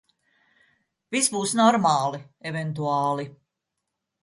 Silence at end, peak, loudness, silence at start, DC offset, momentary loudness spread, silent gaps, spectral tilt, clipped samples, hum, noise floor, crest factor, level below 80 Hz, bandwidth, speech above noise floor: 0.9 s; -6 dBFS; -23 LUFS; 1.1 s; under 0.1%; 13 LU; none; -4 dB/octave; under 0.1%; none; -82 dBFS; 20 dB; -70 dBFS; 11.5 kHz; 59 dB